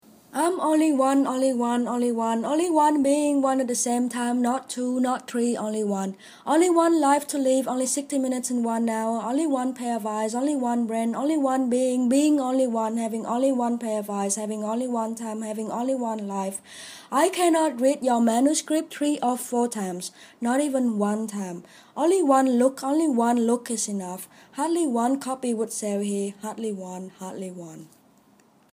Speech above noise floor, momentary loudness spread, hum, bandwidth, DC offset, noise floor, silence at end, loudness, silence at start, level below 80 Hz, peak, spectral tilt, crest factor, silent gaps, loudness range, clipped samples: 35 dB; 12 LU; none; 15.5 kHz; under 0.1%; -59 dBFS; 0.85 s; -24 LUFS; 0.35 s; -76 dBFS; -8 dBFS; -4.5 dB/octave; 16 dB; none; 5 LU; under 0.1%